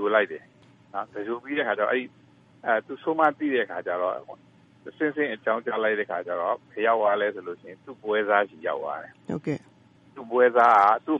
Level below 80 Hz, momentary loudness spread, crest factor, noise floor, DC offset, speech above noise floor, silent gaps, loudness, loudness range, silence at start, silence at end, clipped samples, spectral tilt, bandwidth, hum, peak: -76 dBFS; 16 LU; 20 dB; -56 dBFS; under 0.1%; 31 dB; none; -25 LUFS; 3 LU; 0 s; 0 s; under 0.1%; -6.5 dB/octave; 7.4 kHz; none; -6 dBFS